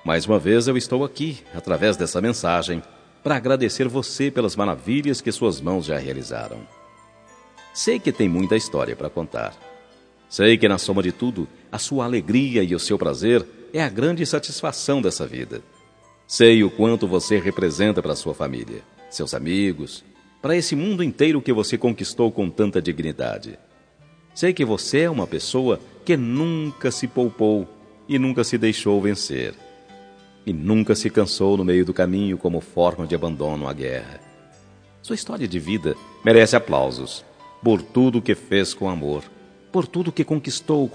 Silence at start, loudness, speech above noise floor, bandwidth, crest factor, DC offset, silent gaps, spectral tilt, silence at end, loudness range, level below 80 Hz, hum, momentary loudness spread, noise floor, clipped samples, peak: 0.05 s; -21 LUFS; 33 dB; 10.5 kHz; 22 dB; under 0.1%; none; -5 dB/octave; 0 s; 5 LU; -52 dBFS; none; 12 LU; -53 dBFS; under 0.1%; 0 dBFS